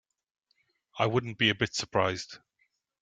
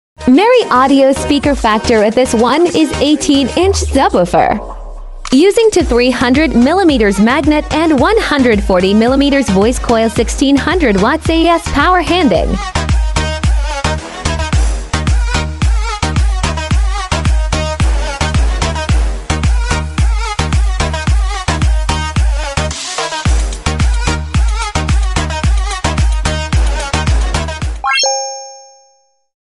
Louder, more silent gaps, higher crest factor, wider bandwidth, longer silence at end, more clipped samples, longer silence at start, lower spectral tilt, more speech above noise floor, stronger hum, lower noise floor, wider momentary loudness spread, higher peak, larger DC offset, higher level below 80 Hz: second, -29 LUFS vs -12 LUFS; neither; first, 24 dB vs 12 dB; second, 9.4 kHz vs 12 kHz; second, 0.65 s vs 0.8 s; neither; first, 0.95 s vs 0.2 s; about the same, -4 dB/octave vs -5 dB/octave; about the same, 46 dB vs 44 dB; neither; first, -75 dBFS vs -54 dBFS; first, 15 LU vs 7 LU; second, -10 dBFS vs 0 dBFS; neither; second, -66 dBFS vs -18 dBFS